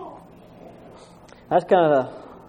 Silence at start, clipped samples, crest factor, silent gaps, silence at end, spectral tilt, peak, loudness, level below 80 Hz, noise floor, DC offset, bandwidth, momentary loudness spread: 0 s; under 0.1%; 20 dB; none; 0.25 s; -7.5 dB/octave; -4 dBFS; -20 LUFS; -60 dBFS; -47 dBFS; under 0.1%; 9.8 kHz; 17 LU